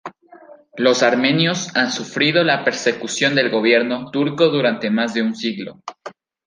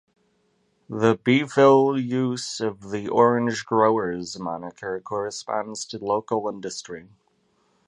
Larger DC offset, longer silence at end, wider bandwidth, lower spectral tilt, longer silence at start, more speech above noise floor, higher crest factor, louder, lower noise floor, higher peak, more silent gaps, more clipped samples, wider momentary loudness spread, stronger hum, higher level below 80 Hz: neither; second, 0.35 s vs 0.85 s; about the same, 10 kHz vs 11 kHz; second, -4 dB/octave vs -5.5 dB/octave; second, 0.05 s vs 0.9 s; second, 27 dB vs 45 dB; about the same, 18 dB vs 20 dB; first, -17 LUFS vs -23 LUFS; second, -44 dBFS vs -67 dBFS; about the same, -2 dBFS vs -2 dBFS; neither; neither; first, 18 LU vs 15 LU; neither; about the same, -68 dBFS vs -64 dBFS